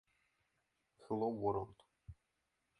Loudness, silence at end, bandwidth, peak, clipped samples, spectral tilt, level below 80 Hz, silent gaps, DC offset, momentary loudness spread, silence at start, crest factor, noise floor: -40 LUFS; 0.65 s; 10.5 kHz; -24 dBFS; under 0.1%; -9.5 dB/octave; -68 dBFS; none; under 0.1%; 23 LU; 1 s; 20 dB; -85 dBFS